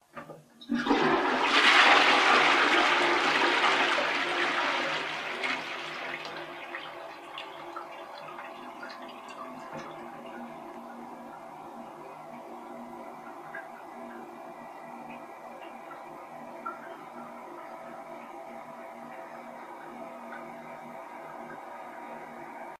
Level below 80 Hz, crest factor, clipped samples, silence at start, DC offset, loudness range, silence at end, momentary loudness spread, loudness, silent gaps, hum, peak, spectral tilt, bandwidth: -70 dBFS; 24 dB; under 0.1%; 0.15 s; under 0.1%; 22 LU; 0.05 s; 22 LU; -24 LUFS; none; none; -8 dBFS; -2 dB/octave; 15.5 kHz